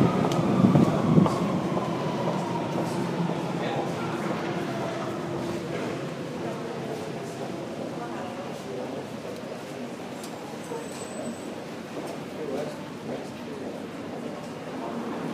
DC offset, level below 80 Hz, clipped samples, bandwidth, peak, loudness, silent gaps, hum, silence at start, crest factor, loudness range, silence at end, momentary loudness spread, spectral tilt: under 0.1%; -60 dBFS; under 0.1%; 15.5 kHz; -4 dBFS; -29 LUFS; none; none; 0 s; 24 dB; 11 LU; 0 s; 14 LU; -6.5 dB/octave